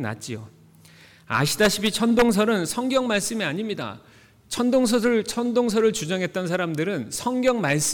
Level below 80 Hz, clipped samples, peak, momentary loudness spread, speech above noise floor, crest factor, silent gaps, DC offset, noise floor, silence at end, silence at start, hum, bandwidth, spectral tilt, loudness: -54 dBFS; under 0.1%; -8 dBFS; 11 LU; 28 dB; 14 dB; none; under 0.1%; -51 dBFS; 0 s; 0 s; none; 19 kHz; -4 dB/octave; -23 LUFS